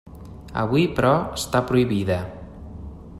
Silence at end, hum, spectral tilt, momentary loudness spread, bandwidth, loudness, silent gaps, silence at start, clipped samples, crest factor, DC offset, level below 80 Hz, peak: 0 s; none; -6 dB/octave; 20 LU; 14.5 kHz; -22 LUFS; none; 0.05 s; under 0.1%; 18 dB; under 0.1%; -42 dBFS; -6 dBFS